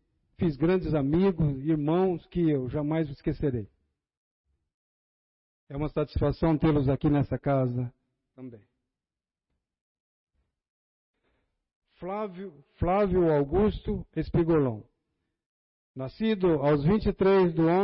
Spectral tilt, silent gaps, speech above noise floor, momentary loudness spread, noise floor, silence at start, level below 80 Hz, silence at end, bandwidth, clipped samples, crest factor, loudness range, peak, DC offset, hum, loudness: -12 dB/octave; 4.17-4.44 s, 4.74-5.67 s, 9.81-10.27 s, 10.70-11.14 s, 11.76-11.82 s, 15.46-15.94 s; over 64 dB; 15 LU; under -90 dBFS; 0.4 s; -44 dBFS; 0 s; 5.6 kHz; under 0.1%; 14 dB; 9 LU; -14 dBFS; under 0.1%; none; -27 LUFS